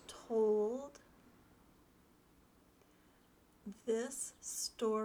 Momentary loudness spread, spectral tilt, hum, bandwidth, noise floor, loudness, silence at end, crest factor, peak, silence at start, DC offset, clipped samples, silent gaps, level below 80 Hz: 19 LU; -3.5 dB/octave; none; 20 kHz; -68 dBFS; -38 LUFS; 0 s; 16 dB; -26 dBFS; 0.05 s; under 0.1%; under 0.1%; none; -74 dBFS